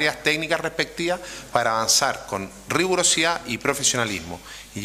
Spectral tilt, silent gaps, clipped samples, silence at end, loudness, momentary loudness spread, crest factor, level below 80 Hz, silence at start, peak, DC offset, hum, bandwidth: -2 dB/octave; none; under 0.1%; 0 s; -22 LUFS; 13 LU; 20 dB; -52 dBFS; 0 s; -4 dBFS; under 0.1%; none; 15.5 kHz